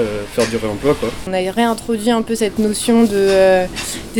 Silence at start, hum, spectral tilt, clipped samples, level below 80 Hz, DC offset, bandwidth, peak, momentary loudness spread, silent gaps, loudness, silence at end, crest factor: 0 s; none; -4.5 dB/octave; under 0.1%; -38 dBFS; under 0.1%; 19 kHz; -2 dBFS; 8 LU; none; -16 LUFS; 0 s; 14 dB